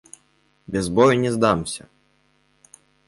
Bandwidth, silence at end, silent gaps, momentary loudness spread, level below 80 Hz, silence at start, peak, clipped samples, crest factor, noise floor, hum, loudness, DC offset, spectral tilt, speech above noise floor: 11.5 kHz; 1.3 s; none; 14 LU; -50 dBFS; 0.7 s; -4 dBFS; under 0.1%; 20 dB; -63 dBFS; none; -20 LUFS; under 0.1%; -5.5 dB/octave; 44 dB